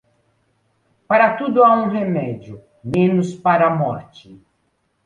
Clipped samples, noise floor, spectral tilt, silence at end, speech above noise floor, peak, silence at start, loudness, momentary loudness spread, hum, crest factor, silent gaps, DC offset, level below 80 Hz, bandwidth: under 0.1%; -67 dBFS; -8 dB/octave; 0.7 s; 50 dB; -2 dBFS; 1.1 s; -17 LUFS; 15 LU; none; 18 dB; none; under 0.1%; -56 dBFS; 9.4 kHz